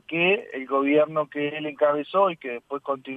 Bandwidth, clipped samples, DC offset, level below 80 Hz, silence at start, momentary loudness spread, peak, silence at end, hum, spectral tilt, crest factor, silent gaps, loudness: 4.6 kHz; under 0.1%; under 0.1%; -76 dBFS; 0.1 s; 10 LU; -8 dBFS; 0 s; none; -7.5 dB/octave; 16 dB; none; -24 LUFS